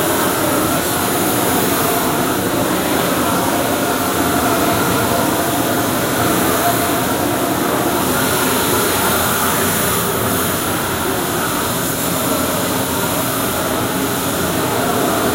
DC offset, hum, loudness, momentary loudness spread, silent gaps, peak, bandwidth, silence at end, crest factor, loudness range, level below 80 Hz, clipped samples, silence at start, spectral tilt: under 0.1%; none; -16 LUFS; 3 LU; none; -2 dBFS; 16 kHz; 0 s; 14 dB; 2 LU; -42 dBFS; under 0.1%; 0 s; -3.5 dB/octave